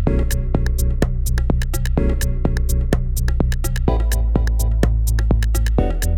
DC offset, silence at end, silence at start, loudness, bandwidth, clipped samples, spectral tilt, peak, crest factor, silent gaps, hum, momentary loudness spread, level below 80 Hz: under 0.1%; 0 s; 0 s; -20 LUFS; 17 kHz; under 0.1%; -6 dB/octave; 0 dBFS; 16 dB; none; none; 3 LU; -18 dBFS